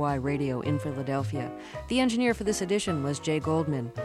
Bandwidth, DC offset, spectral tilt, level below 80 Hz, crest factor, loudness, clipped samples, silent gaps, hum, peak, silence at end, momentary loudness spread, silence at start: 14 kHz; under 0.1%; -5.5 dB/octave; -50 dBFS; 16 dB; -29 LUFS; under 0.1%; none; none; -12 dBFS; 0 s; 6 LU; 0 s